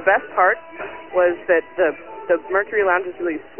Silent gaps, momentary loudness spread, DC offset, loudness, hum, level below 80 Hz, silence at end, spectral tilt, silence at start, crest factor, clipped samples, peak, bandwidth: none; 9 LU; 0.4%; -20 LUFS; none; -58 dBFS; 0.2 s; -8 dB/octave; 0 s; 18 dB; under 0.1%; -2 dBFS; 3.2 kHz